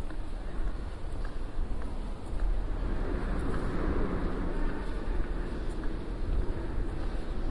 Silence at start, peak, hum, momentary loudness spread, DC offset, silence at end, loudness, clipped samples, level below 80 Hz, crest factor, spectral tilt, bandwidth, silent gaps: 0 s; -18 dBFS; none; 7 LU; under 0.1%; 0 s; -37 LUFS; under 0.1%; -32 dBFS; 12 dB; -7.5 dB/octave; 10.5 kHz; none